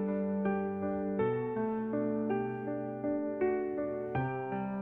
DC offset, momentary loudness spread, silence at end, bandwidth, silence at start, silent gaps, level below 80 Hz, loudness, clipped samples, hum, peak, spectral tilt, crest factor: under 0.1%; 4 LU; 0 s; 3.8 kHz; 0 s; none; -68 dBFS; -34 LUFS; under 0.1%; none; -20 dBFS; -11 dB/octave; 14 dB